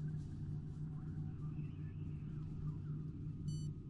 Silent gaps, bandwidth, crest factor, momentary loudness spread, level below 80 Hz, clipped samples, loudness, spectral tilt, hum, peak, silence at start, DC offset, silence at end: none; 11 kHz; 12 dB; 3 LU; -56 dBFS; under 0.1%; -46 LUFS; -8.5 dB/octave; none; -32 dBFS; 0 s; under 0.1%; 0 s